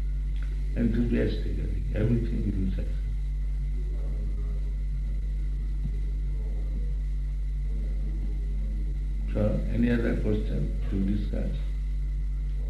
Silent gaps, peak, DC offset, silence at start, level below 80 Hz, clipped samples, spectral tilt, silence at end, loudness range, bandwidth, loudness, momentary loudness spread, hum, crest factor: none; -12 dBFS; under 0.1%; 0 s; -28 dBFS; under 0.1%; -9 dB/octave; 0 s; 4 LU; 4.7 kHz; -31 LUFS; 6 LU; none; 14 dB